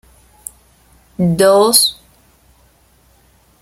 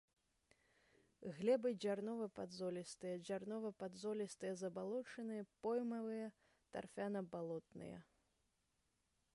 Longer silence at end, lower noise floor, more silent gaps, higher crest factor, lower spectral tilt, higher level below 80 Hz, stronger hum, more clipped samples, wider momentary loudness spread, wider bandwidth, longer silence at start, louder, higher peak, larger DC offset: first, 1.7 s vs 1.3 s; second, -52 dBFS vs -85 dBFS; neither; about the same, 18 dB vs 20 dB; second, -3.5 dB/octave vs -6 dB/octave; first, -50 dBFS vs -84 dBFS; neither; neither; first, 24 LU vs 13 LU; first, 16.5 kHz vs 11.5 kHz; about the same, 1.2 s vs 1.2 s; first, -11 LUFS vs -46 LUFS; first, 0 dBFS vs -28 dBFS; neither